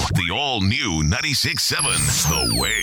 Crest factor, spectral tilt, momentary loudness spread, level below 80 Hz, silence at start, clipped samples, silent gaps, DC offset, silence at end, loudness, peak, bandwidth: 12 dB; -2.5 dB/octave; 3 LU; -34 dBFS; 0 s; under 0.1%; none; under 0.1%; 0 s; -19 LUFS; -8 dBFS; over 20 kHz